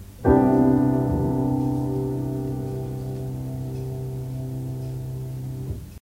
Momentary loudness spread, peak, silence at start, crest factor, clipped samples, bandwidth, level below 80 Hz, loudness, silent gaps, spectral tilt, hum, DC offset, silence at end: 14 LU; -6 dBFS; 0 s; 18 dB; under 0.1%; 16 kHz; -40 dBFS; -25 LUFS; none; -9.5 dB/octave; 50 Hz at -45 dBFS; under 0.1%; 0.1 s